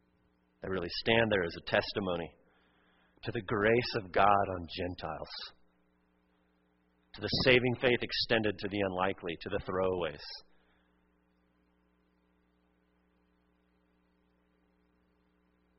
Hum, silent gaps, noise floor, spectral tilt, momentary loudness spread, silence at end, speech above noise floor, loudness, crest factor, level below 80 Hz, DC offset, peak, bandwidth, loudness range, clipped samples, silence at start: none; none; -72 dBFS; -3 dB/octave; 16 LU; 5.4 s; 41 dB; -31 LUFS; 26 dB; -58 dBFS; under 0.1%; -8 dBFS; 5.8 kHz; 9 LU; under 0.1%; 0.65 s